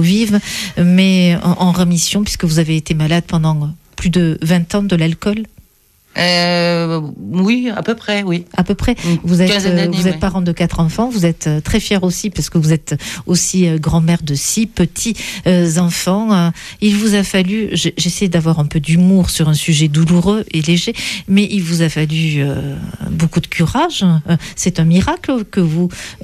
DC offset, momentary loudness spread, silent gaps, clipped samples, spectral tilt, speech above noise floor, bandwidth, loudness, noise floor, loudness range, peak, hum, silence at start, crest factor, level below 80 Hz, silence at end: under 0.1%; 6 LU; none; under 0.1%; -5 dB/octave; 38 dB; 14 kHz; -14 LUFS; -52 dBFS; 3 LU; -2 dBFS; none; 0 s; 12 dB; -34 dBFS; 0.1 s